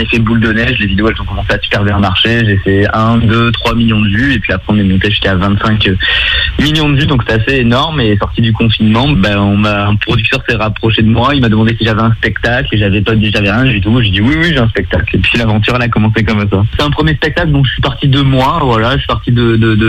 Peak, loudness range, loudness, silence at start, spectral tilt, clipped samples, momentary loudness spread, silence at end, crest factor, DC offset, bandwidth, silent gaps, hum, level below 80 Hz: 0 dBFS; 1 LU; -10 LUFS; 0 s; -7 dB/octave; under 0.1%; 3 LU; 0 s; 10 dB; under 0.1%; 8.8 kHz; none; none; -24 dBFS